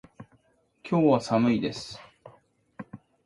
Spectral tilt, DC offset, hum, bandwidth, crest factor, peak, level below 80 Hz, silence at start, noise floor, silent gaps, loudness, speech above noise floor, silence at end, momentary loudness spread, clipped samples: -7 dB/octave; under 0.1%; none; 11.5 kHz; 20 dB; -10 dBFS; -64 dBFS; 0.2 s; -66 dBFS; none; -25 LUFS; 42 dB; 0.3 s; 23 LU; under 0.1%